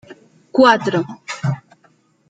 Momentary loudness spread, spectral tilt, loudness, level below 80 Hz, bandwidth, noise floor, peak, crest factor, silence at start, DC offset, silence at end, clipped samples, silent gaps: 14 LU; -6 dB/octave; -17 LUFS; -62 dBFS; 9.2 kHz; -57 dBFS; 0 dBFS; 18 dB; 0.1 s; under 0.1%; 0.7 s; under 0.1%; none